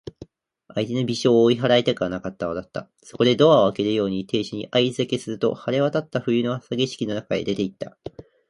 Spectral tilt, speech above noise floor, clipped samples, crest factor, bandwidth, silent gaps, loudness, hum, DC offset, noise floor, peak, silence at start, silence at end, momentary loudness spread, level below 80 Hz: -6 dB/octave; 31 dB; under 0.1%; 18 dB; 11.5 kHz; none; -22 LUFS; none; under 0.1%; -53 dBFS; -4 dBFS; 0.05 s; 0.3 s; 14 LU; -58 dBFS